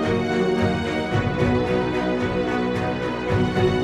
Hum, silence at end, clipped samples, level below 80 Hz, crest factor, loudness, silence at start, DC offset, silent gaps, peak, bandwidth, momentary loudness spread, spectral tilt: none; 0 s; under 0.1%; -40 dBFS; 14 dB; -22 LUFS; 0 s; under 0.1%; none; -8 dBFS; 11.5 kHz; 3 LU; -7 dB/octave